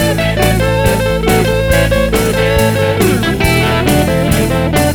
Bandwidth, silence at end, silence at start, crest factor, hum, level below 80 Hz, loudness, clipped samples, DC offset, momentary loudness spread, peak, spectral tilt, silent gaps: over 20 kHz; 0 s; 0 s; 12 dB; none; -22 dBFS; -12 LUFS; under 0.1%; under 0.1%; 1 LU; 0 dBFS; -5 dB/octave; none